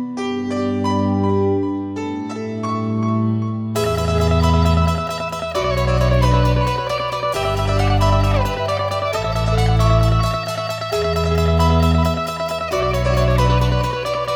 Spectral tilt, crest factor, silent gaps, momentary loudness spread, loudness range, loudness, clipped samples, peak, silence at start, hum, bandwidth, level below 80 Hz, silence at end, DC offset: -6.5 dB/octave; 14 dB; none; 8 LU; 3 LU; -18 LUFS; under 0.1%; -2 dBFS; 0 s; none; 18 kHz; -26 dBFS; 0 s; 0.1%